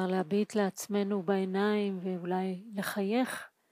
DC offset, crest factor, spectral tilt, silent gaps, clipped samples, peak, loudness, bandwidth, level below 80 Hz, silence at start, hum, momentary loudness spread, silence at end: under 0.1%; 16 dB; -6 dB/octave; none; under 0.1%; -16 dBFS; -32 LUFS; 15.5 kHz; -82 dBFS; 0 s; none; 6 LU; 0.25 s